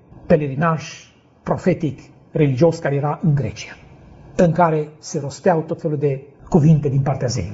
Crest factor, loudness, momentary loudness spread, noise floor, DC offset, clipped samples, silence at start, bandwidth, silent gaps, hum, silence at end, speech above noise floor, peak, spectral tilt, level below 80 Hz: 18 dB; -19 LUFS; 14 LU; -43 dBFS; under 0.1%; under 0.1%; 0.25 s; 8 kHz; none; none; 0 s; 25 dB; -2 dBFS; -7.5 dB/octave; -46 dBFS